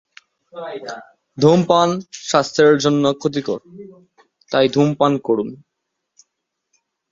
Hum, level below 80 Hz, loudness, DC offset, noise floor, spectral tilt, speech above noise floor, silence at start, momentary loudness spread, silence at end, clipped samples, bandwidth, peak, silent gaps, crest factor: none; -60 dBFS; -17 LUFS; under 0.1%; -77 dBFS; -5.5 dB/octave; 60 dB; 0.55 s; 18 LU; 1.55 s; under 0.1%; 7.8 kHz; 0 dBFS; none; 18 dB